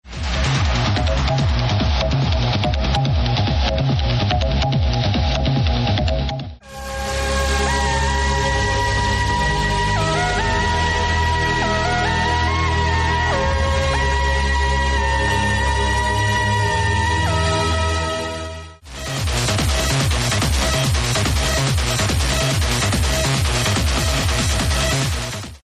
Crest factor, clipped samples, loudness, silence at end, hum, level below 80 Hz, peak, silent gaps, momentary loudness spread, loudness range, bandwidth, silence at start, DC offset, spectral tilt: 12 dB; under 0.1%; -19 LUFS; 0.15 s; none; -24 dBFS; -6 dBFS; none; 4 LU; 2 LU; 15 kHz; 0.05 s; under 0.1%; -4 dB/octave